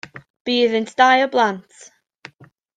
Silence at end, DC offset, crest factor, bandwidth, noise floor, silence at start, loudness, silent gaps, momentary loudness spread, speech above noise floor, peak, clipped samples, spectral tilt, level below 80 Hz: 1.15 s; under 0.1%; 18 dB; 9.2 kHz; -50 dBFS; 0.15 s; -17 LUFS; 0.30-0.34 s, 0.40-0.45 s; 18 LU; 33 dB; -2 dBFS; under 0.1%; -3.5 dB/octave; -70 dBFS